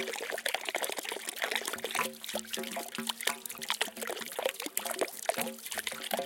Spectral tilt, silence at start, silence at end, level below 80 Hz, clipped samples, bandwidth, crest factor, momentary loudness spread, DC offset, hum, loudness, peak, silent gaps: -0.5 dB/octave; 0 s; 0 s; -78 dBFS; under 0.1%; 17 kHz; 26 dB; 4 LU; under 0.1%; none; -34 LUFS; -10 dBFS; none